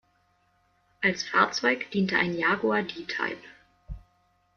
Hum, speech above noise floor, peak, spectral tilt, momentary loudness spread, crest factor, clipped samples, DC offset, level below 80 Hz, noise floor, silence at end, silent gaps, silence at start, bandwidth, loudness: none; 41 dB; -6 dBFS; -4.5 dB/octave; 23 LU; 24 dB; under 0.1%; under 0.1%; -54 dBFS; -68 dBFS; 0.6 s; none; 1 s; 7.2 kHz; -26 LUFS